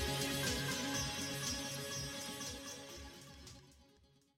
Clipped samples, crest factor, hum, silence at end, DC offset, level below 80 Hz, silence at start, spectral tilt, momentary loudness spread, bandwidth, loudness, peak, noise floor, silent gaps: under 0.1%; 14 dB; none; 0.5 s; under 0.1%; -56 dBFS; 0 s; -2.5 dB/octave; 18 LU; 16 kHz; -40 LUFS; -28 dBFS; -69 dBFS; none